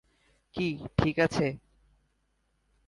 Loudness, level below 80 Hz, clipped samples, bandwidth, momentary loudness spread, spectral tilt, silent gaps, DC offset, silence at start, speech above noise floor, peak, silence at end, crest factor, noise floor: -29 LUFS; -50 dBFS; under 0.1%; 11.5 kHz; 13 LU; -6.5 dB/octave; none; under 0.1%; 0.55 s; 46 dB; -8 dBFS; 1.3 s; 24 dB; -74 dBFS